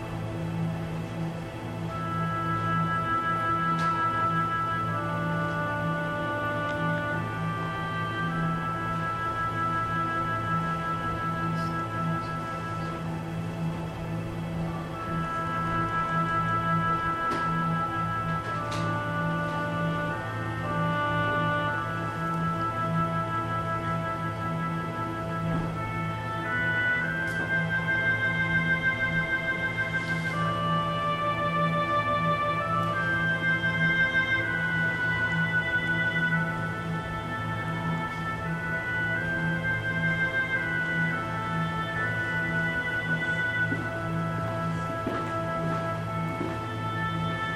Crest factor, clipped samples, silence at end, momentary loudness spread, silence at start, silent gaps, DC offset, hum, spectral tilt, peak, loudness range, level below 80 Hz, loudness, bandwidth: 14 dB; under 0.1%; 0 s; 7 LU; 0 s; none; under 0.1%; none; -6.5 dB/octave; -14 dBFS; 5 LU; -50 dBFS; -28 LUFS; 13 kHz